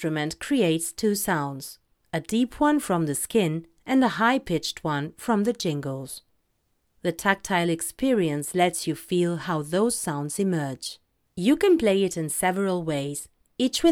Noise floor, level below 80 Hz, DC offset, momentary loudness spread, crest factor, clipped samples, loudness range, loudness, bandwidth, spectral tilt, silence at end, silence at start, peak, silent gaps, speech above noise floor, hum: -72 dBFS; -56 dBFS; under 0.1%; 11 LU; 20 dB; under 0.1%; 3 LU; -25 LUFS; 18.5 kHz; -4.5 dB/octave; 0 s; 0 s; -6 dBFS; none; 47 dB; none